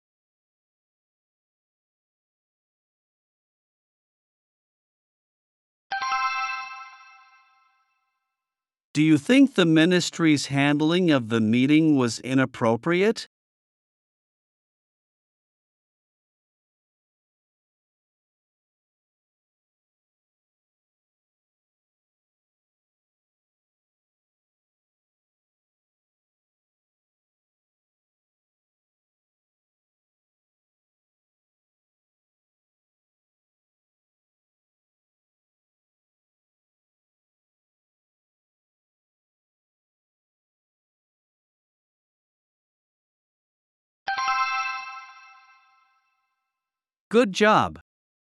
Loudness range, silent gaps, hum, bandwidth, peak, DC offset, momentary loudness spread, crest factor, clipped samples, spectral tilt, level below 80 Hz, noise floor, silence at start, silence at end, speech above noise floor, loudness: 11 LU; 8.84-8.94 s, 13.26-44.06 s, 47.00-47.11 s; none; 12 kHz; -6 dBFS; under 0.1%; 15 LU; 24 dB; under 0.1%; -5.5 dB/octave; -74 dBFS; under -90 dBFS; 5.9 s; 0.55 s; over 70 dB; -22 LUFS